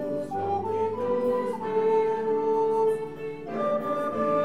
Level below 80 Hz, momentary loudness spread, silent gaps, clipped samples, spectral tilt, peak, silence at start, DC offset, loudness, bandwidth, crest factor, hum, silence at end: -64 dBFS; 7 LU; none; under 0.1%; -7.5 dB/octave; -14 dBFS; 0 s; 0.4%; -27 LUFS; 11 kHz; 12 dB; none; 0 s